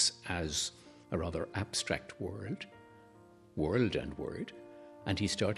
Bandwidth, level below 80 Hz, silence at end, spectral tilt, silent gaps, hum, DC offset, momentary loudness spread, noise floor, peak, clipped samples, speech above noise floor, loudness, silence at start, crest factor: 13 kHz; -56 dBFS; 0 s; -4 dB/octave; none; none; under 0.1%; 14 LU; -59 dBFS; -16 dBFS; under 0.1%; 24 dB; -36 LUFS; 0 s; 22 dB